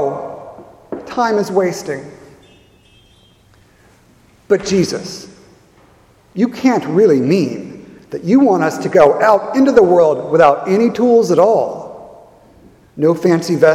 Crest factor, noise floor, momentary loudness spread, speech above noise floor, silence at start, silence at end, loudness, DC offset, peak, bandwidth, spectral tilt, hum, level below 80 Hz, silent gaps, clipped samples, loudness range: 14 dB; -49 dBFS; 19 LU; 37 dB; 0 s; 0 s; -13 LUFS; under 0.1%; 0 dBFS; 15 kHz; -6 dB/octave; none; -54 dBFS; none; under 0.1%; 11 LU